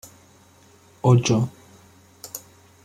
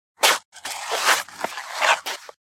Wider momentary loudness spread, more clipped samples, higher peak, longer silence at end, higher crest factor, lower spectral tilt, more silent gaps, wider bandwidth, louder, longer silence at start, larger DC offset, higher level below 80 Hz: first, 20 LU vs 12 LU; neither; about the same, -4 dBFS vs -2 dBFS; first, 0.45 s vs 0.2 s; about the same, 20 dB vs 22 dB; first, -6 dB/octave vs 1.5 dB/octave; second, none vs 0.45-0.52 s; about the same, 15.5 kHz vs 16.5 kHz; about the same, -21 LUFS vs -22 LUFS; first, 1.05 s vs 0.2 s; neither; first, -58 dBFS vs -78 dBFS